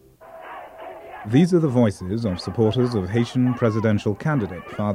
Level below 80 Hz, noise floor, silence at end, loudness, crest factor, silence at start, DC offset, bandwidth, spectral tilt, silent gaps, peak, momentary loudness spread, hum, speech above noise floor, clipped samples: -52 dBFS; -42 dBFS; 0 s; -21 LUFS; 16 dB; 0.2 s; under 0.1%; 11.5 kHz; -8 dB/octave; none; -4 dBFS; 20 LU; none; 22 dB; under 0.1%